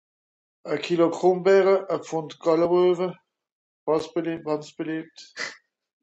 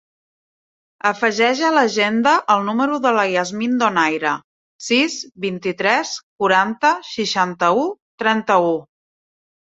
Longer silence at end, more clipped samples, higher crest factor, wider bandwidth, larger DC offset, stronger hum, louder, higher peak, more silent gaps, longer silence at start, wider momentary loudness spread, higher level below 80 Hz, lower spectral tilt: second, 0.5 s vs 0.8 s; neither; about the same, 18 dB vs 18 dB; about the same, 8.2 kHz vs 8 kHz; neither; neither; second, -24 LUFS vs -18 LUFS; second, -8 dBFS vs 0 dBFS; second, 3.52-3.87 s vs 4.44-4.79 s, 6.23-6.38 s, 8.02-8.18 s; second, 0.65 s vs 1.05 s; first, 15 LU vs 8 LU; about the same, -70 dBFS vs -66 dBFS; first, -6 dB/octave vs -3.5 dB/octave